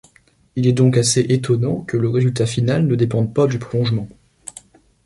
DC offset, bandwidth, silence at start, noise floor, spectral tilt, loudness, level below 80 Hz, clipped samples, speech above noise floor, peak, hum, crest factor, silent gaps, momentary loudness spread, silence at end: under 0.1%; 11.5 kHz; 0.55 s; -55 dBFS; -6 dB/octave; -18 LUFS; -50 dBFS; under 0.1%; 38 dB; -2 dBFS; none; 16 dB; none; 20 LU; 0.55 s